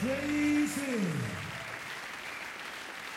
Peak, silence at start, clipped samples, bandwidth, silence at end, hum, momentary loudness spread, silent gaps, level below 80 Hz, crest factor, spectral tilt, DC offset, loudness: -20 dBFS; 0 s; under 0.1%; 16.5 kHz; 0 s; none; 11 LU; none; -64 dBFS; 14 dB; -4.5 dB/octave; under 0.1%; -34 LUFS